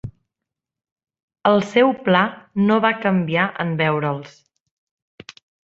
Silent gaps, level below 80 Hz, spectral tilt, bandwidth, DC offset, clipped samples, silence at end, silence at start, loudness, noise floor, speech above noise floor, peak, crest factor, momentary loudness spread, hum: 0.92-0.96 s, 1.23-1.28 s; -58 dBFS; -7 dB/octave; 7.8 kHz; under 0.1%; under 0.1%; 1.4 s; 0.05 s; -19 LUFS; -85 dBFS; 66 dB; -2 dBFS; 20 dB; 7 LU; none